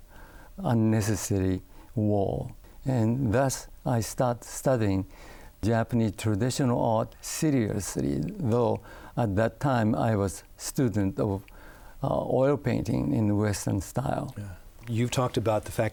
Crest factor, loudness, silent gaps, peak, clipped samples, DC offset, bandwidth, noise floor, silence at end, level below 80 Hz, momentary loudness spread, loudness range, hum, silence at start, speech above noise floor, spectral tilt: 14 dB; -28 LUFS; none; -12 dBFS; under 0.1%; under 0.1%; over 20 kHz; -48 dBFS; 0 s; -50 dBFS; 10 LU; 1 LU; none; 0 s; 21 dB; -6.5 dB/octave